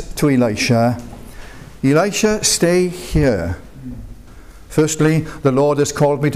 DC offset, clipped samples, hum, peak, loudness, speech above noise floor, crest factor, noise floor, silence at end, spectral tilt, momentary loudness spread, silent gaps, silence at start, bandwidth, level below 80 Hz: 0.6%; under 0.1%; none; -4 dBFS; -16 LUFS; 24 dB; 12 dB; -39 dBFS; 0 s; -5 dB/octave; 19 LU; none; 0 s; 16 kHz; -34 dBFS